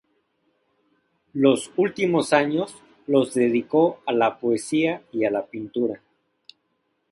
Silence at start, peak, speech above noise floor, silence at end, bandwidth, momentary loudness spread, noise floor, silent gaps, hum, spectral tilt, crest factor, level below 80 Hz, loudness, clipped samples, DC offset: 1.35 s; -4 dBFS; 51 dB; 1.15 s; 11.5 kHz; 9 LU; -72 dBFS; none; none; -5.5 dB/octave; 20 dB; -66 dBFS; -22 LUFS; under 0.1%; under 0.1%